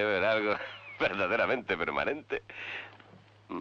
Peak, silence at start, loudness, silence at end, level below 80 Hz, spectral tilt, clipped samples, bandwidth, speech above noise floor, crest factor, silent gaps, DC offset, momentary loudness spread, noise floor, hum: -16 dBFS; 0 s; -31 LUFS; 0 s; -64 dBFS; -5.5 dB/octave; under 0.1%; 7.4 kHz; 25 dB; 16 dB; none; under 0.1%; 14 LU; -56 dBFS; none